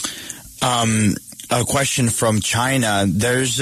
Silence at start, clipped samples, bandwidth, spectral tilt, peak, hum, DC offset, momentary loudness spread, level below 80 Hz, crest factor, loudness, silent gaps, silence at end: 0 s; under 0.1%; 14 kHz; -4 dB/octave; -6 dBFS; none; under 0.1%; 8 LU; -46 dBFS; 14 dB; -18 LUFS; none; 0 s